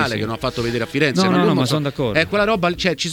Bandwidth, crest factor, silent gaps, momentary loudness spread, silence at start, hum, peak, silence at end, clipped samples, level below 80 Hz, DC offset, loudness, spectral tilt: 18 kHz; 16 dB; none; 7 LU; 0 s; none; -2 dBFS; 0 s; under 0.1%; -44 dBFS; under 0.1%; -18 LUFS; -5 dB/octave